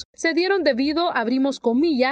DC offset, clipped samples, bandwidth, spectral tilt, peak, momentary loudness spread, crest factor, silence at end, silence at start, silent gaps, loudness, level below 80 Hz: under 0.1%; under 0.1%; 9.2 kHz; -3.5 dB/octave; -6 dBFS; 2 LU; 14 dB; 0 s; 0 s; 0.05-0.13 s; -21 LUFS; -58 dBFS